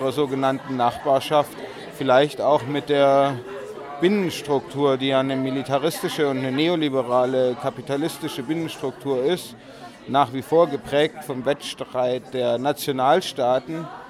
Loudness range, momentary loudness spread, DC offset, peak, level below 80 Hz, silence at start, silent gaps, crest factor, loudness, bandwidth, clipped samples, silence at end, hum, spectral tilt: 3 LU; 10 LU; under 0.1%; -4 dBFS; -62 dBFS; 0 s; none; 18 dB; -22 LUFS; 16 kHz; under 0.1%; 0 s; none; -5.5 dB/octave